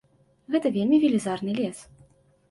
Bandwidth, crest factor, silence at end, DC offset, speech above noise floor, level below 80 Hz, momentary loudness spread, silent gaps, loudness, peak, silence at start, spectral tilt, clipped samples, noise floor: 11.5 kHz; 16 dB; 0.65 s; under 0.1%; 35 dB; -66 dBFS; 10 LU; none; -25 LUFS; -10 dBFS; 0.5 s; -6 dB/octave; under 0.1%; -58 dBFS